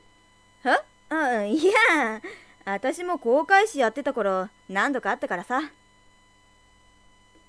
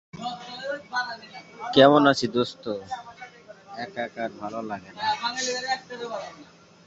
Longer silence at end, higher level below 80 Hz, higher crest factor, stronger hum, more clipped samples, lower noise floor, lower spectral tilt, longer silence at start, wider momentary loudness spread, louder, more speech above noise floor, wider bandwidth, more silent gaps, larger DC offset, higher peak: first, 1.8 s vs 0.45 s; about the same, -64 dBFS vs -66 dBFS; about the same, 20 dB vs 24 dB; neither; neither; first, -58 dBFS vs -46 dBFS; about the same, -3.5 dB/octave vs -4 dB/octave; first, 0.65 s vs 0.15 s; second, 12 LU vs 22 LU; about the same, -24 LUFS vs -25 LUFS; first, 34 dB vs 22 dB; first, 11 kHz vs 8 kHz; neither; neither; second, -6 dBFS vs -2 dBFS